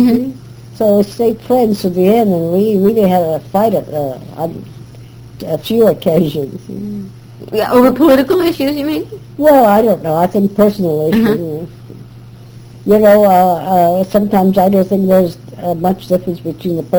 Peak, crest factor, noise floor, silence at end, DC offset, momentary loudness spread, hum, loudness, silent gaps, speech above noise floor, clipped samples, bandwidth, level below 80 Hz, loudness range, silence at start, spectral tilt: 0 dBFS; 12 dB; -34 dBFS; 0 s; under 0.1%; 15 LU; none; -12 LUFS; none; 23 dB; under 0.1%; over 20 kHz; -44 dBFS; 5 LU; 0 s; -7.5 dB/octave